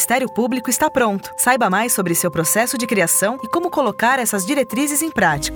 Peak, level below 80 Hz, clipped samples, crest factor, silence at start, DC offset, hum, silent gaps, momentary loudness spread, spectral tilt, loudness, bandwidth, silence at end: -2 dBFS; -48 dBFS; under 0.1%; 16 dB; 0 s; under 0.1%; none; none; 4 LU; -3 dB/octave; -17 LUFS; over 20 kHz; 0 s